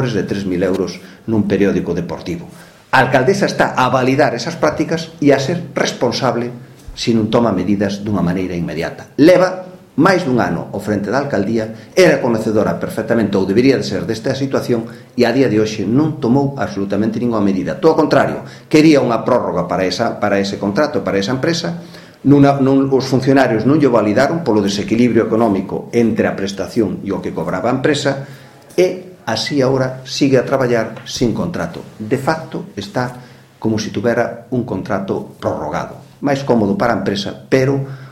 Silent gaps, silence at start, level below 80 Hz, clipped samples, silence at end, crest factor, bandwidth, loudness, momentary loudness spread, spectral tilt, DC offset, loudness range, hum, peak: none; 0 s; -46 dBFS; under 0.1%; 0 s; 16 dB; 15 kHz; -16 LUFS; 10 LU; -6 dB/octave; under 0.1%; 5 LU; none; 0 dBFS